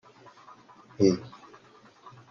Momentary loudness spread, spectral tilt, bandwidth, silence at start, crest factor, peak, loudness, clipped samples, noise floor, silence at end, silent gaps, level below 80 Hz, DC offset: 27 LU; -6.5 dB/octave; 7 kHz; 1 s; 22 dB; -10 dBFS; -26 LUFS; under 0.1%; -56 dBFS; 1 s; none; -70 dBFS; under 0.1%